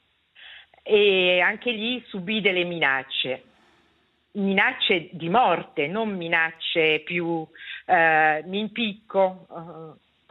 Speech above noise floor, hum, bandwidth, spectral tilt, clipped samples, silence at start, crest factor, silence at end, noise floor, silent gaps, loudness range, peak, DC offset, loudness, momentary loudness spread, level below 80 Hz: 42 dB; none; 5.2 kHz; -7.5 dB/octave; under 0.1%; 0.4 s; 20 dB; 0.4 s; -65 dBFS; none; 2 LU; -4 dBFS; under 0.1%; -22 LUFS; 17 LU; -70 dBFS